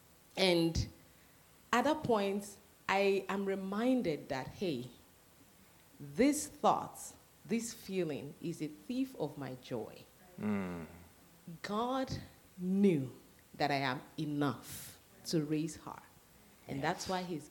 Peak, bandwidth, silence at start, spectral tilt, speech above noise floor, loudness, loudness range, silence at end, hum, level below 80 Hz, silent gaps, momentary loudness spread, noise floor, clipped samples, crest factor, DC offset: -14 dBFS; 19 kHz; 0.35 s; -5 dB/octave; 27 dB; -36 LUFS; 7 LU; 0 s; none; -60 dBFS; none; 17 LU; -63 dBFS; under 0.1%; 24 dB; under 0.1%